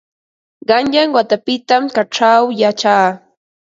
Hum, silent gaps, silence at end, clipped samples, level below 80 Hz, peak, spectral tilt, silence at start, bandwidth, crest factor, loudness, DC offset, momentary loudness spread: none; none; 0.45 s; under 0.1%; -60 dBFS; 0 dBFS; -4 dB/octave; 0.7 s; 7.8 kHz; 14 dB; -13 LUFS; under 0.1%; 6 LU